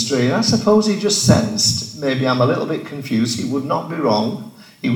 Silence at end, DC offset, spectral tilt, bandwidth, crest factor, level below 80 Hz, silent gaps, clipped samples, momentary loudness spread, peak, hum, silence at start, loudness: 0 s; under 0.1%; -4.5 dB/octave; 19 kHz; 18 dB; -50 dBFS; none; under 0.1%; 9 LU; 0 dBFS; none; 0 s; -17 LUFS